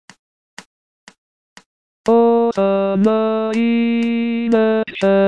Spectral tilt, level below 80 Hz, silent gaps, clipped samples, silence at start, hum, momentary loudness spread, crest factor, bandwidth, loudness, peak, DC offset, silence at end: -7 dB/octave; -62 dBFS; 0.66-1.07 s, 1.18-1.56 s, 1.66-2.04 s; under 0.1%; 0.6 s; none; 4 LU; 14 dB; 9.2 kHz; -16 LUFS; -2 dBFS; 0.3%; 0 s